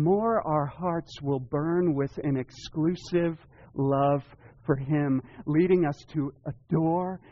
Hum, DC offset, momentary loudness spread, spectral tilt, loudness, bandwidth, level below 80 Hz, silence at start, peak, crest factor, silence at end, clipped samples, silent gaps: none; under 0.1%; 8 LU; -8 dB/octave; -28 LUFS; 7.2 kHz; -56 dBFS; 0 s; -12 dBFS; 16 dB; 0.15 s; under 0.1%; none